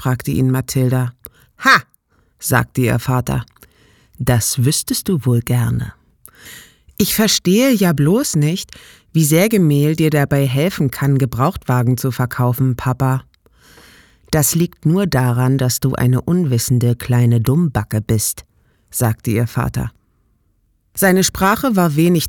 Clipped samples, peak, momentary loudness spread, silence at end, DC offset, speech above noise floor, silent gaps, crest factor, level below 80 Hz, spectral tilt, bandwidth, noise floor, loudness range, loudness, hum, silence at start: under 0.1%; 0 dBFS; 9 LU; 0 s; under 0.1%; 45 dB; none; 16 dB; -40 dBFS; -5 dB/octave; 19.5 kHz; -61 dBFS; 4 LU; -16 LUFS; none; 0 s